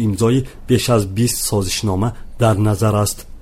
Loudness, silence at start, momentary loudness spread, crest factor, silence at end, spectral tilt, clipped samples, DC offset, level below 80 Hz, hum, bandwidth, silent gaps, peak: -17 LUFS; 0 s; 5 LU; 14 dB; 0.05 s; -5.5 dB/octave; under 0.1%; under 0.1%; -34 dBFS; none; 16 kHz; none; -2 dBFS